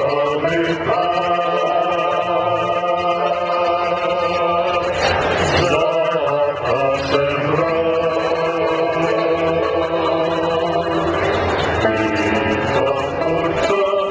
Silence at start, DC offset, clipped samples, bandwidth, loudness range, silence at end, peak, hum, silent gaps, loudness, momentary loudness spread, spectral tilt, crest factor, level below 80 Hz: 0 s; under 0.1%; under 0.1%; 8 kHz; 1 LU; 0 s; -2 dBFS; none; none; -18 LUFS; 2 LU; -5.5 dB/octave; 14 dB; -40 dBFS